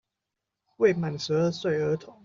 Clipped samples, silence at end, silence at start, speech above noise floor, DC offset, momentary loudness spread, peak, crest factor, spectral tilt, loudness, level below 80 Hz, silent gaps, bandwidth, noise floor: under 0.1%; 0.15 s; 0.8 s; 60 dB; under 0.1%; 5 LU; -10 dBFS; 18 dB; -6 dB/octave; -26 LUFS; -66 dBFS; none; 7.6 kHz; -86 dBFS